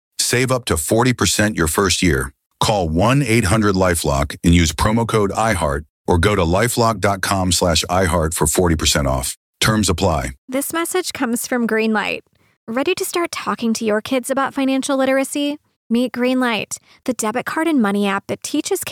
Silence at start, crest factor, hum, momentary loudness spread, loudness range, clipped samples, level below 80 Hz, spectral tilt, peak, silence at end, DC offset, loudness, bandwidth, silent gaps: 0.2 s; 14 dB; none; 7 LU; 4 LU; under 0.1%; -34 dBFS; -4.5 dB/octave; -2 dBFS; 0 s; under 0.1%; -18 LUFS; 17.5 kHz; 2.46-2.50 s, 5.89-6.05 s, 9.37-9.54 s, 10.38-10.48 s, 12.57-12.67 s, 15.76-15.90 s